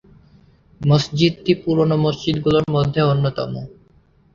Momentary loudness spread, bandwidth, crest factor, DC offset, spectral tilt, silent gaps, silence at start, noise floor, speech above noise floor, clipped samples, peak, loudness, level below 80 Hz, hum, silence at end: 9 LU; 7.4 kHz; 18 dB; under 0.1%; -7 dB/octave; none; 0.8 s; -54 dBFS; 37 dB; under 0.1%; -2 dBFS; -18 LUFS; -46 dBFS; none; 0.65 s